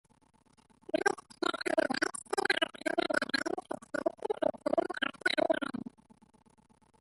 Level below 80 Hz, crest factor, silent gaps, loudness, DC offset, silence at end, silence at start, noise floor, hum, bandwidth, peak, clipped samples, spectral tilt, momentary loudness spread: -74 dBFS; 22 dB; none; -33 LUFS; under 0.1%; 1.15 s; 0.95 s; -66 dBFS; none; 12 kHz; -14 dBFS; under 0.1%; -3 dB/octave; 7 LU